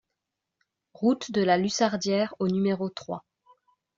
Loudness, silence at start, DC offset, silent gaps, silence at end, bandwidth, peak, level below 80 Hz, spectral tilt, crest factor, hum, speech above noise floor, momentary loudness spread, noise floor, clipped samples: -26 LUFS; 1 s; under 0.1%; none; 0.8 s; 7.8 kHz; -10 dBFS; -68 dBFS; -5 dB/octave; 18 dB; none; 59 dB; 12 LU; -85 dBFS; under 0.1%